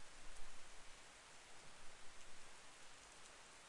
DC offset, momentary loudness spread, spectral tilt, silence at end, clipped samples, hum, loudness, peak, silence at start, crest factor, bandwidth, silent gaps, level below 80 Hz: under 0.1%; 1 LU; -1.5 dB/octave; 0 s; under 0.1%; none; -60 LUFS; -36 dBFS; 0 s; 16 dB; 11.5 kHz; none; -64 dBFS